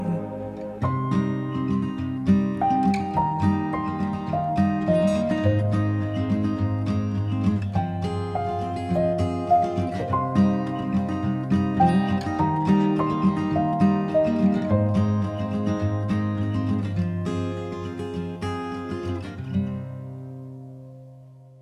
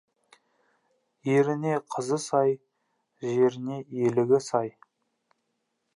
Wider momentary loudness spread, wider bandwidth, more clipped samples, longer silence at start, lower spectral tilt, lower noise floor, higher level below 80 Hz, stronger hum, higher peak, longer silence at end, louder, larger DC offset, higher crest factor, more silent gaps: about the same, 10 LU vs 12 LU; about the same, 10.5 kHz vs 11.5 kHz; neither; second, 0 s vs 1.25 s; first, -8.5 dB/octave vs -6.5 dB/octave; second, -46 dBFS vs -78 dBFS; first, -50 dBFS vs -78 dBFS; neither; about the same, -8 dBFS vs -10 dBFS; second, 0.1 s vs 1.25 s; first, -24 LUFS vs -27 LUFS; neither; about the same, 16 dB vs 18 dB; neither